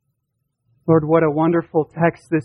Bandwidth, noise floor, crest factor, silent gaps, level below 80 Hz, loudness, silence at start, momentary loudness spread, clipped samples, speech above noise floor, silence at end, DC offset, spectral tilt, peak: 5.2 kHz; -74 dBFS; 16 dB; none; -54 dBFS; -18 LUFS; 0.85 s; 6 LU; under 0.1%; 56 dB; 0 s; under 0.1%; -10 dB/octave; -4 dBFS